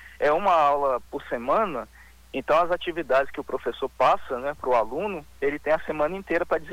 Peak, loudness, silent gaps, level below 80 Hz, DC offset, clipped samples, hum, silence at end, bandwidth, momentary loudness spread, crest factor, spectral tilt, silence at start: -10 dBFS; -25 LUFS; none; -52 dBFS; under 0.1%; under 0.1%; none; 0 s; 18 kHz; 10 LU; 16 dB; -5.5 dB/octave; 0 s